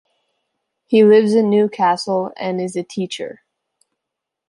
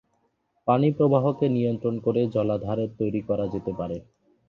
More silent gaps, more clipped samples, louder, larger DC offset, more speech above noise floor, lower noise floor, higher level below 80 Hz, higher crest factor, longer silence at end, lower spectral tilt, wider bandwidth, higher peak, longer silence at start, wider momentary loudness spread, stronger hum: neither; neither; first, -16 LUFS vs -25 LUFS; neither; first, 66 dB vs 47 dB; first, -82 dBFS vs -71 dBFS; second, -70 dBFS vs -56 dBFS; about the same, 16 dB vs 18 dB; first, 1.15 s vs 0.45 s; second, -6 dB/octave vs -10.5 dB/octave; first, 11.5 kHz vs 6.6 kHz; first, -2 dBFS vs -6 dBFS; first, 0.9 s vs 0.65 s; first, 14 LU vs 10 LU; neither